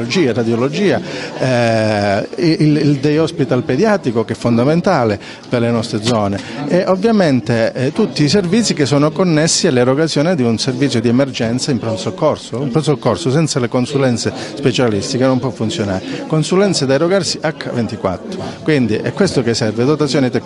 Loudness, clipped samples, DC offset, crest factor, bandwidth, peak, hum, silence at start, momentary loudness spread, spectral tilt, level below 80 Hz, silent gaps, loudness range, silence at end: -15 LUFS; under 0.1%; under 0.1%; 14 dB; 11.5 kHz; 0 dBFS; none; 0 s; 6 LU; -5.5 dB/octave; -50 dBFS; none; 3 LU; 0 s